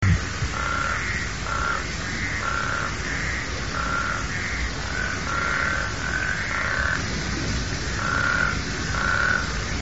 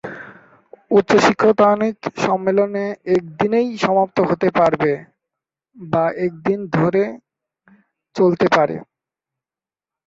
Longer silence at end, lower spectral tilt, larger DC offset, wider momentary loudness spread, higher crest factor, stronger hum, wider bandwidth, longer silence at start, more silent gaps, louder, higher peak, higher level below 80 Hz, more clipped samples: second, 0 s vs 1.25 s; second, -3 dB/octave vs -6.5 dB/octave; first, 1% vs under 0.1%; second, 5 LU vs 9 LU; about the same, 18 dB vs 18 dB; neither; about the same, 8 kHz vs 7.8 kHz; about the same, 0 s vs 0.05 s; neither; second, -25 LUFS vs -17 LUFS; second, -8 dBFS vs -2 dBFS; first, -34 dBFS vs -58 dBFS; neither